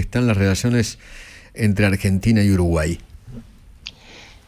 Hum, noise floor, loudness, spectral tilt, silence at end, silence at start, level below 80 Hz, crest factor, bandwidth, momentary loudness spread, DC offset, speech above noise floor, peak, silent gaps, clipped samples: none; -44 dBFS; -19 LUFS; -6 dB/octave; 0.25 s; 0 s; -32 dBFS; 14 dB; 15.5 kHz; 23 LU; under 0.1%; 26 dB; -6 dBFS; none; under 0.1%